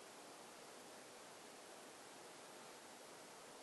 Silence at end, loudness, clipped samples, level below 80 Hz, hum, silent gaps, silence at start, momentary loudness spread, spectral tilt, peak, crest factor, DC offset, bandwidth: 0 s; -57 LUFS; under 0.1%; under -90 dBFS; none; none; 0 s; 0 LU; -1.5 dB/octave; -46 dBFS; 12 dB; under 0.1%; 12 kHz